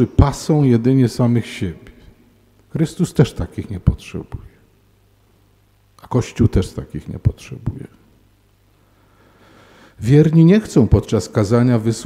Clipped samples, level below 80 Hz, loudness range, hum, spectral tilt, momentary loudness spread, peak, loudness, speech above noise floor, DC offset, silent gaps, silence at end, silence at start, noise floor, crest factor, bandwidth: under 0.1%; -32 dBFS; 8 LU; none; -7.5 dB/octave; 18 LU; 0 dBFS; -17 LUFS; 39 dB; under 0.1%; none; 0 s; 0 s; -55 dBFS; 18 dB; 13.5 kHz